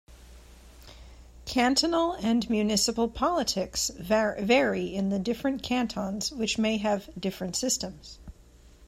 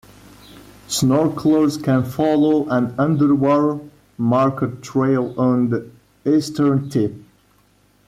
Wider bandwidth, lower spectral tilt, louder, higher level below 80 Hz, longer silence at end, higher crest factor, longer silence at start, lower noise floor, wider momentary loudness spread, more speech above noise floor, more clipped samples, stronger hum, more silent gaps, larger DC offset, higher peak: about the same, 16 kHz vs 15 kHz; second, -3.5 dB/octave vs -6.5 dB/octave; second, -27 LUFS vs -18 LUFS; about the same, -50 dBFS vs -54 dBFS; second, 0 s vs 0.85 s; first, 18 dB vs 12 dB; second, 0.1 s vs 0.55 s; about the same, -54 dBFS vs -57 dBFS; about the same, 8 LU vs 8 LU; second, 27 dB vs 39 dB; neither; neither; neither; neither; second, -10 dBFS vs -6 dBFS